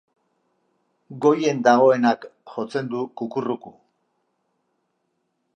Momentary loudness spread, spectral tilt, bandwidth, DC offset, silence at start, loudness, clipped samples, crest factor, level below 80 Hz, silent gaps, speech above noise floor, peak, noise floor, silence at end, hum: 15 LU; -6 dB/octave; 9 kHz; under 0.1%; 1.1 s; -21 LUFS; under 0.1%; 20 dB; -78 dBFS; none; 53 dB; -4 dBFS; -73 dBFS; 1.85 s; none